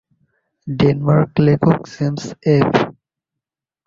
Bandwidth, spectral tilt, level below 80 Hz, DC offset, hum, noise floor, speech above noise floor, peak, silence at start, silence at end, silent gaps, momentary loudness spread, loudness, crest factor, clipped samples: 7.4 kHz; -8 dB/octave; -48 dBFS; under 0.1%; none; -85 dBFS; 70 dB; -2 dBFS; 0.65 s; 0.95 s; none; 10 LU; -16 LUFS; 16 dB; under 0.1%